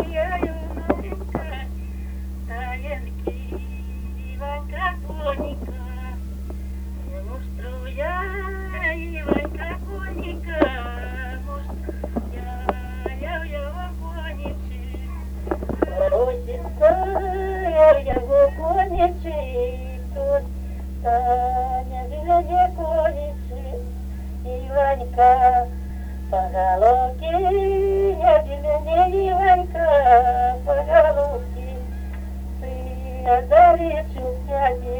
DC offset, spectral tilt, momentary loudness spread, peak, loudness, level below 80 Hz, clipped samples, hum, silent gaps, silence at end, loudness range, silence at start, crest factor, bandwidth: under 0.1%; -7.5 dB/octave; 16 LU; -2 dBFS; -22 LUFS; -30 dBFS; under 0.1%; none; none; 0 s; 12 LU; 0 s; 20 dB; over 20 kHz